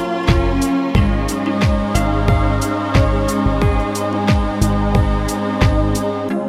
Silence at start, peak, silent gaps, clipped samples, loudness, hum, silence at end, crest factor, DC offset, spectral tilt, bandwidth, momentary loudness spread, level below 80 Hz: 0 s; 0 dBFS; none; under 0.1%; -17 LUFS; none; 0 s; 16 dB; under 0.1%; -6.5 dB/octave; 16 kHz; 3 LU; -20 dBFS